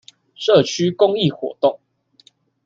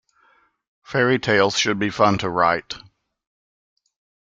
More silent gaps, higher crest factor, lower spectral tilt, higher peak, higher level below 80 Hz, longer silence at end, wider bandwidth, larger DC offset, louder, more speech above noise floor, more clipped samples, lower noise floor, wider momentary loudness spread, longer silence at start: neither; about the same, 18 dB vs 22 dB; first, -5.5 dB/octave vs -4 dB/octave; about the same, -2 dBFS vs -2 dBFS; about the same, -62 dBFS vs -58 dBFS; second, 0.9 s vs 1.55 s; second, 7.6 kHz vs 9.2 kHz; neither; about the same, -18 LUFS vs -19 LUFS; about the same, 38 dB vs 41 dB; neither; second, -55 dBFS vs -60 dBFS; about the same, 7 LU vs 9 LU; second, 0.4 s vs 0.9 s